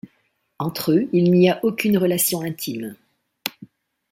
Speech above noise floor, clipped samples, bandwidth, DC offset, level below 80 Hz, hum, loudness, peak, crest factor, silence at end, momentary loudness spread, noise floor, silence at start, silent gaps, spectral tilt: 48 dB; under 0.1%; 16.5 kHz; under 0.1%; -62 dBFS; none; -20 LUFS; 0 dBFS; 22 dB; 0.45 s; 15 LU; -67 dBFS; 0.6 s; none; -5.5 dB/octave